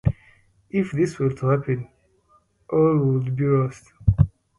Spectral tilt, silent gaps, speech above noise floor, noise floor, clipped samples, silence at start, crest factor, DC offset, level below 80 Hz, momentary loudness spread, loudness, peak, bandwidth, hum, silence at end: -9.5 dB/octave; none; 40 dB; -61 dBFS; under 0.1%; 0.05 s; 20 dB; under 0.1%; -38 dBFS; 9 LU; -23 LUFS; -2 dBFS; 11 kHz; none; 0.3 s